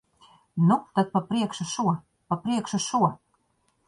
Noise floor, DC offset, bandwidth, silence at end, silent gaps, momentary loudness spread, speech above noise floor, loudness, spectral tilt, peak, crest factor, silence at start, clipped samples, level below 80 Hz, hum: -70 dBFS; under 0.1%; 11.5 kHz; 0.7 s; none; 8 LU; 45 dB; -26 LUFS; -5.5 dB/octave; -8 dBFS; 18 dB; 0.55 s; under 0.1%; -66 dBFS; none